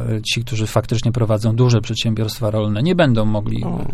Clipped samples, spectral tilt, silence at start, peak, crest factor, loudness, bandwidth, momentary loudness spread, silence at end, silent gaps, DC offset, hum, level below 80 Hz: under 0.1%; -6 dB/octave; 0 s; -2 dBFS; 16 dB; -18 LUFS; 14 kHz; 5 LU; 0 s; none; under 0.1%; none; -34 dBFS